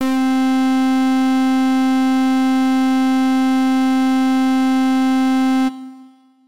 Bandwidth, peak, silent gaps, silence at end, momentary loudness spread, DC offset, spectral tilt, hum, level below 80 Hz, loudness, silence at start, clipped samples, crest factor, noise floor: 14 kHz; -12 dBFS; none; 0 s; 1 LU; 1%; -3.5 dB/octave; none; -62 dBFS; -16 LUFS; 0 s; under 0.1%; 4 dB; -45 dBFS